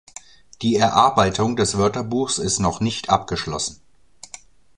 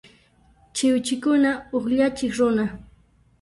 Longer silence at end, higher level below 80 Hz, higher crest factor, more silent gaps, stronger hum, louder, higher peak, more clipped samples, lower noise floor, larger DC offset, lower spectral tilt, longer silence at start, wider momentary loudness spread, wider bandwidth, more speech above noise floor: first, 1.05 s vs 0.6 s; first, -44 dBFS vs -54 dBFS; first, 20 dB vs 14 dB; neither; neither; about the same, -20 LUFS vs -22 LUFS; first, -2 dBFS vs -10 dBFS; neither; second, -48 dBFS vs -57 dBFS; first, 0.3% vs under 0.1%; about the same, -4 dB/octave vs -4.5 dB/octave; second, 0.6 s vs 0.75 s; first, 24 LU vs 9 LU; about the same, 11 kHz vs 11.5 kHz; second, 28 dB vs 36 dB